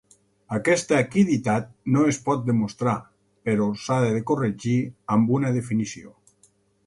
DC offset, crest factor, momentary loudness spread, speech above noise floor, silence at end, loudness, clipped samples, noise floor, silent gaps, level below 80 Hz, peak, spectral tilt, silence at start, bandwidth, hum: under 0.1%; 16 dB; 7 LU; 39 dB; 0.8 s; -23 LUFS; under 0.1%; -62 dBFS; none; -60 dBFS; -8 dBFS; -6.5 dB/octave; 0.5 s; 11.5 kHz; none